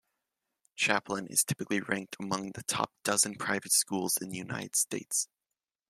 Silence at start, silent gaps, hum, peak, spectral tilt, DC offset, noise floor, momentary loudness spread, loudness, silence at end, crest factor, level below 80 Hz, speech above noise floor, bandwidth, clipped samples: 0.75 s; none; none; -10 dBFS; -2 dB/octave; under 0.1%; -90 dBFS; 9 LU; -30 LUFS; 0.65 s; 24 dB; -74 dBFS; 58 dB; 16 kHz; under 0.1%